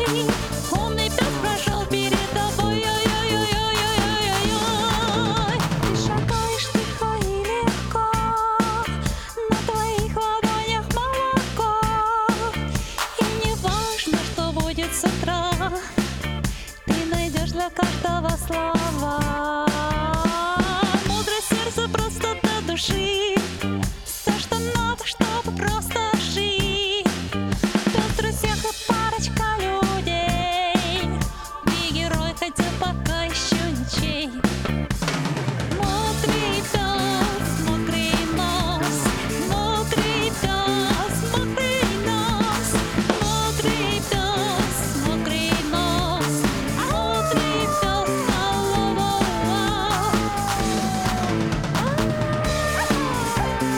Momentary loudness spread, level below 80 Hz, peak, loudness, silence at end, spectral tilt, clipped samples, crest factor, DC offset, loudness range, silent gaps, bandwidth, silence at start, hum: 4 LU; -34 dBFS; 0 dBFS; -22 LUFS; 0 s; -4 dB/octave; under 0.1%; 22 dB; under 0.1%; 2 LU; none; 19.5 kHz; 0 s; none